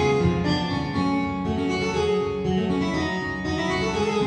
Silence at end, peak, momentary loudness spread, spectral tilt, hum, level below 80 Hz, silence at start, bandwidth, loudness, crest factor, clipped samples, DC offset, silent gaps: 0 s; -10 dBFS; 4 LU; -6 dB/octave; none; -42 dBFS; 0 s; 10 kHz; -24 LUFS; 14 dB; under 0.1%; under 0.1%; none